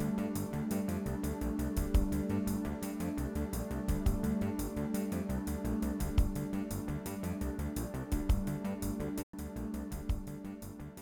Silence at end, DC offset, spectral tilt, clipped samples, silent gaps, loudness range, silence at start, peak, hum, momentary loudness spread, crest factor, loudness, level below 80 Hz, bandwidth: 0 s; under 0.1%; -6.5 dB/octave; under 0.1%; 9.23-9.33 s; 3 LU; 0 s; -18 dBFS; none; 7 LU; 18 dB; -37 LUFS; -40 dBFS; 18.5 kHz